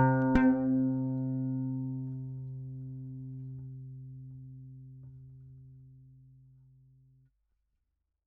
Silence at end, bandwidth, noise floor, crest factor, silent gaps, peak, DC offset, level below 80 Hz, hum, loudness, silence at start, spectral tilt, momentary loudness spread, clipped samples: 2.1 s; 3.9 kHz; -82 dBFS; 24 dB; none; -10 dBFS; under 0.1%; -52 dBFS; 50 Hz at -65 dBFS; -32 LUFS; 0 s; -9 dB/octave; 26 LU; under 0.1%